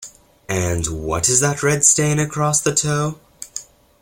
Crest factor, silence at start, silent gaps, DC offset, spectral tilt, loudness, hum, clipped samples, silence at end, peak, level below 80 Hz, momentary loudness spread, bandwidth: 20 dB; 0 s; none; under 0.1%; -3.5 dB/octave; -17 LUFS; none; under 0.1%; 0.4 s; 0 dBFS; -42 dBFS; 18 LU; 16.5 kHz